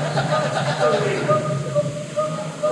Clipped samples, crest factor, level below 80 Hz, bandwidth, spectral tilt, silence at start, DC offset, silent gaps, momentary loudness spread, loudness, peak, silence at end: under 0.1%; 14 dB; -58 dBFS; 12 kHz; -5.5 dB/octave; 0 s; under 0.1%; none; 6 LU; -21 LUFS; -6 dBFS; 0 s